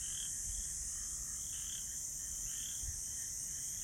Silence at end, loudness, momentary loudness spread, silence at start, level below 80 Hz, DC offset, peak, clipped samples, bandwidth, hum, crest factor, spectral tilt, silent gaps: 0 s; -39 LUFS; 1 LU; 0 s; -54 dBFS; under 0.1%; -28 dBFS; under 0.1%; 16 kHz; none; 14 dB; 0 dB/octave; none